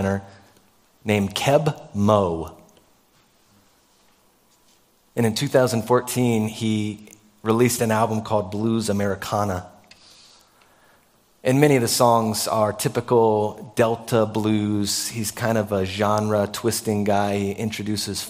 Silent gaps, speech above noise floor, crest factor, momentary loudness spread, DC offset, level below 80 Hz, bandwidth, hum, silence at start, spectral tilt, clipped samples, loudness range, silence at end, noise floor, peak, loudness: none; 38 dB; 22 dB; 8 LU; under 0.1%; -56 dBFS; 16 kHz; none; 0 s; -5 dB/octave; under 0.1%; 7 LU; 0 s; -59 dBFS; 0 dBFS; -22 LUFS